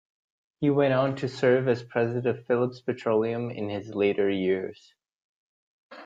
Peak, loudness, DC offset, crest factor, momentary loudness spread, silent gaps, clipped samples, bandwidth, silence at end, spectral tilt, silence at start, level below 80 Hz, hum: -10 dBFS; -26 LUFS; under 0.1%; 18 dB; 8 LU; 5.14-5.90 s; under 0.1%; 7.8 kHz; 0 s; -7.5 dB/octave; 0.6 s; -68 dBFS; none